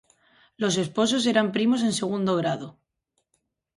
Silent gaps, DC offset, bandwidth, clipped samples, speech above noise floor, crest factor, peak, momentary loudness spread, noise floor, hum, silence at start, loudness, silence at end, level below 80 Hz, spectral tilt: none; under 0.1%; 11.5 kHz; under 0.1%; 53 dB; 20 dB; -6 dBFS; 7 LU; -77 dBFS; none; 0.6 s; -24 LUFS; 1.05 s; -68 dBFS; -4.5 dB/octave